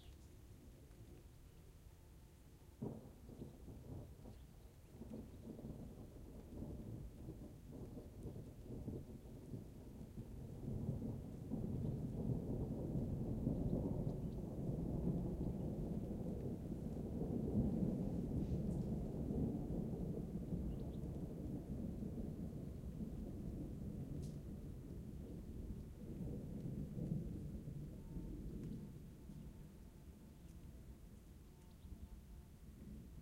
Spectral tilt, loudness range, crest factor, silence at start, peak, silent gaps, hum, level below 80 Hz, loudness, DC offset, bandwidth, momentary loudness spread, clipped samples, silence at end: -9.5 dB/octave; 13 LU; 20 dB; 0 s; -26 dBFS; none; none; -54 dBFS; -47 LUFS; under 0.1%; 16 kHz; 18 LU; under 0.1%; 0 s